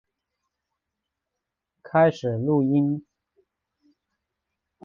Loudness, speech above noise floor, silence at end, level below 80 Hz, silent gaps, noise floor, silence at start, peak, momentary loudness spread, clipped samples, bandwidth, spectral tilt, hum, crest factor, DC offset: -23 LUFS; 63 dB; 1.85 s; -66 dBFS; none; -84 dBFS; 1.85 s; -8 dBFS; 7 LU; under 0.1%; 7.2 kHz; -9 dB/octave; none; 20 dB; under 0.1%